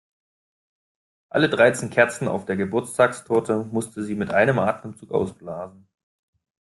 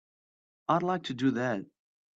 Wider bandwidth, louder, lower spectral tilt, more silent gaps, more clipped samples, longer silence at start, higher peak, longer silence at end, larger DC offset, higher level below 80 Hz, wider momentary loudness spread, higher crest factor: first, 12.5 kHz vs 7.8 kHz; first, -22 LUFS vs -31 LUFS; about the same, -5.5 dB/octave vs -6.5 dB/octave; neither; neither; first, 1.35 s vs 0.7 s; first, -2 dBFS vs -12 dBFS; first, 0.95 s vs 0.5 s; neither; first, -62 dBFS vs -74 dBFS; first, 13 LU vs 8 LU; about the same, 22 dB vs 20 dB